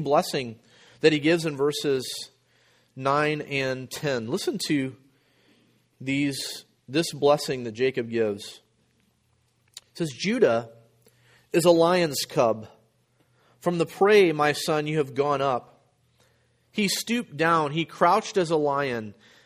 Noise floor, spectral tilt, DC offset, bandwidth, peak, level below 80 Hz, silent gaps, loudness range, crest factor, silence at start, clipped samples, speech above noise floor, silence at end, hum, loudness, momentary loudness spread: -68 dBFS; -4.5 dB/octave; under 0.1%; 15.5 kHz; -6 dBFS; -68 dBFS; none; 5 LU; 20 dB; 0 s; under 0.1%; 44 dB; 0.35 s; none; -25 LUFS; 13 LU